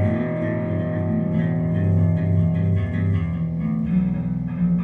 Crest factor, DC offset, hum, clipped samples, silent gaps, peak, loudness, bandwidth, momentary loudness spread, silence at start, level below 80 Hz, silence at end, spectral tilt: 12 dB; under 0.1%; none; under 0.1%; none; -10 dBFS; -22 LUFS; 3.6 kHz; 5 LU; 0 s; -40 dBFS; 0 s; -11.5 dB/octave